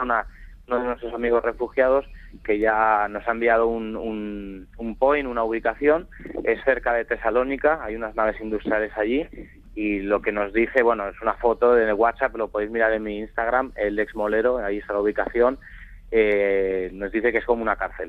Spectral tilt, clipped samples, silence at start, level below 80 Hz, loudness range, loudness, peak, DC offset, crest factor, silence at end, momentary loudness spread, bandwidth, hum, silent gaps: -7.5 dB/octave; under 0.1%; 0 s; -44 dBFS; 2 LU; -23 LUFS; -4 dBFS; under 0.1%; 18 dB; 0 s; 9 LU; 4.7 kHz; none; none